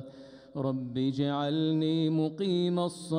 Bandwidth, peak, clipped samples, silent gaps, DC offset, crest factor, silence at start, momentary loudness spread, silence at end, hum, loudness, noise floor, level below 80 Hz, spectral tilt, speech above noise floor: 11 kHz; -18 dBFS; under 0.1%; none; under 0.1%; 12 dB; 0 s; 6 LU; 0 s; none; -30 LUFS; -49 dBFS; -72 dBFS; -7 dB/octave; 20 dB